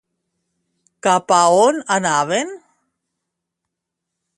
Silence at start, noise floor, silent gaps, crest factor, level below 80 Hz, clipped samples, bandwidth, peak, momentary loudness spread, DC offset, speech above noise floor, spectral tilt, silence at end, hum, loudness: 1.05 s; -80 dBFS; none; 20 dB; -68 dBFS; under 0.1%; 11.5 kHz; 0 dBFS; 9 LU; under 0.1%; 65 dB; -3 dB/octave; 1.8 s; none; -16 LUFS